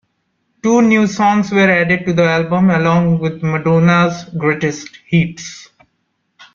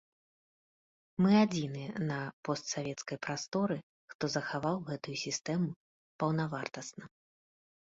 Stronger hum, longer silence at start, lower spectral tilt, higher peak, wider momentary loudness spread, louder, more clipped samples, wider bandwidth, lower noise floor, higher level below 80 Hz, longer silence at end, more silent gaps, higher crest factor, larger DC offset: neither; second, 0.65 s vs 1.2 s; about the same, -6.5 dB/octave vs -5.5 dB/octave; first, 0 dBFS vs -16 dBFS; second, 9 LU vs 13 LU; first, -14 LUFS vs -34 LUFS; neither; about the same, 7.4 kHz vs 7.8 kHz; second, -67 dBFS vs under -90 dBFS; first, -50 dBFS vs -72 dBFS; second, 0.1 s vs 0.85 s; second, none vs 2.33-2.43 s, 3.48-3.52 s, 3.83-4.08 s, 4.15-4.19 s, 5.76-6.19 s; second, 14 dB vs 20 dB; neither